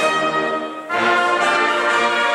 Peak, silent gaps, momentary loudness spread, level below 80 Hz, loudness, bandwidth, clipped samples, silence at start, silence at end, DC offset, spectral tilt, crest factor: -4 dBFS; none; 7 LU; -66 dBFS; -17 LUFS; 13.5 kHz; under 0.1%; 0 s; 0 s; under 0.1%; -2.5 dB/octave; 14 dB